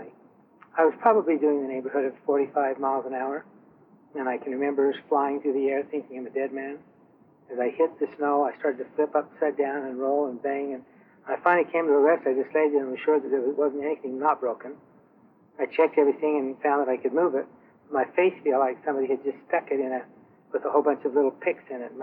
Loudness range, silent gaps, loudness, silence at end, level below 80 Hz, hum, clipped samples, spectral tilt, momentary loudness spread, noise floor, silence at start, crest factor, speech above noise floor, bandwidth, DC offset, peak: 4 LU; none; -26 LUFS; 0 s; -84 dBFS; none; under 0.1%; -8.5 dB/octave; 12 LU; -58 dBFS; 0 s; 18 dB; 33 dB; 4 kHz; under 0.1%; -8 dBFS